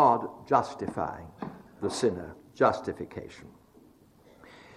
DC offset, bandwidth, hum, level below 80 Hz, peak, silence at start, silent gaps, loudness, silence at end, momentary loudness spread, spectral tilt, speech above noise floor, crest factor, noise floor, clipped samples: under 0.1%; 13.5 kHz; none; -62 dBFS; -8 dBFS; 0 s; none; -30 LUFS; 1.3 s; 17 LU; -5.5 dB/octave; 30 dB; 22 dB; -58 dBFS; under 0.1%